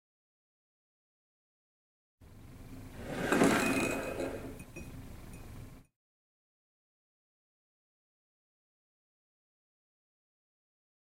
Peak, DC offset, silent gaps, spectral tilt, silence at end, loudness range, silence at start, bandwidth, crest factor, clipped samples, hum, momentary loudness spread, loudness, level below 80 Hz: -12 dBFS; under 0.1%; none; -4.5 dB/octave; 5.25 s; 19 LU; 2.2 s; 16 kHz; 28 dB; under 0.1%; none; 24 LU; -32 LUFS; -56 dBFS